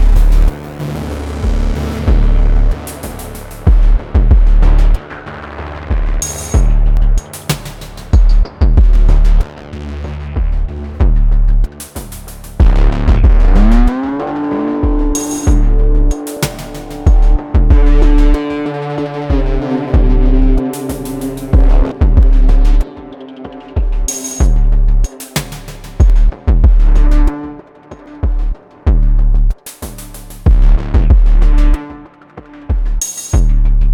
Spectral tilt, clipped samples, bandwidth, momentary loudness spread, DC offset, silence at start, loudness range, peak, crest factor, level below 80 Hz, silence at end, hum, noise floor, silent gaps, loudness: -6 dB/octave; 0.2%; 14 kHz; 15 LU; under 0.1%; 0 s; 3 LU; 0 dBFS; 10 dB; -10 dBFS; 0 s; none; -35 dBFS; none; -15 LUFS